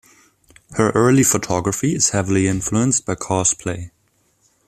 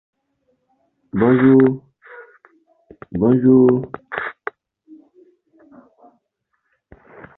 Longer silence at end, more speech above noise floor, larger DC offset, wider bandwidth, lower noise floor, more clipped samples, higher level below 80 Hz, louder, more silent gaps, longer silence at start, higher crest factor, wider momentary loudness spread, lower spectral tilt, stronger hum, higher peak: second, 0.8 s vs 3.05 s; second, 45 dB vs 59 dB; neither; first, 15 kHz vs 4 kHz; second, -62 dBFS vs -72 dBFS; neither; first, -48 dBFS vs -54 dBFS; about the same, -18 LUFS vs -16 LUFS; neither; second, 0.7 s vs 1.15 s; about the same, 18 dB vs 18 dB; second, 12 LU vs 19 LU; second, -4.5 dB/octave vs -12 dB/octave; neither; about the same, -2 dBFS vs -2 dBFS